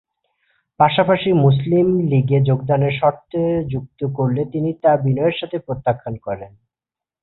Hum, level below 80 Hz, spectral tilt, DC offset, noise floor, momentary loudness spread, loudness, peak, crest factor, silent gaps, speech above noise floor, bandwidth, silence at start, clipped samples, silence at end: none; -50 dBFS; -12.5 dB/octave; under 0.1%; -89 dBFS; 11 LU; -18 LUFS; -2 dBFS; 16 dB; none; 71 dB; 4.1 kHz; 0.8 s; under 0.1%; 0.75 s